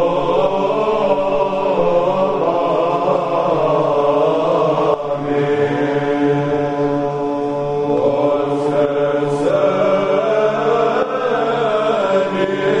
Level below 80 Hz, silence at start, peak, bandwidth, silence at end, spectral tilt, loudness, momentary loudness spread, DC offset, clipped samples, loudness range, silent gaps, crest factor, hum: -48 dBFS; 0 s; -2 dBFS; 9.8 kHz; 0 s; -7 dB/octave; -16 LUFS; 3 LU; under 0.1%; under 0.1%; 2 LU; none; 14 dB; none